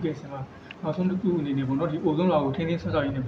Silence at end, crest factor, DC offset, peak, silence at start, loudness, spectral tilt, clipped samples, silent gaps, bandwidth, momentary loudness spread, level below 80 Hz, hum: 0 s; 16 dB; under 0.1%; -10 dBFS; 0 s; -26 LUFS; -9 dB/octave; under 0.1%; none; 6.6 kHz; 13 LU; -54 dBFS; none